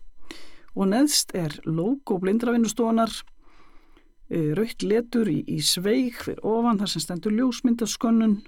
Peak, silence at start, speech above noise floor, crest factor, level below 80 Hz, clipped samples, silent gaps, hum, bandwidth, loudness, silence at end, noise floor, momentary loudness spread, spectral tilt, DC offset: -8 dBFS; 0 s; 27 dB; 16 dB; -52 dBFS; under 0.1%; none; none; 17 kHz; -24 LUFS; 0.05 s; -50 dBFS; 8 LU; -4.5 dB/octave; under 0.1%